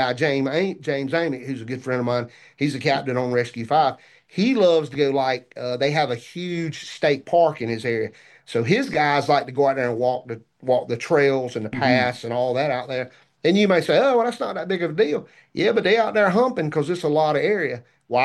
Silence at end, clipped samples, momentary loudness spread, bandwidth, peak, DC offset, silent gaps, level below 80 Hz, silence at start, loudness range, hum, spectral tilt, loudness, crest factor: 0 s; under 0.1%; 11 LU; 12 kHz; -4 dBFS; under 0.1%; none; -64 dBFS; 0 s; 3 LU; none; -6 dB/octave; -22 LUFS; 18 dB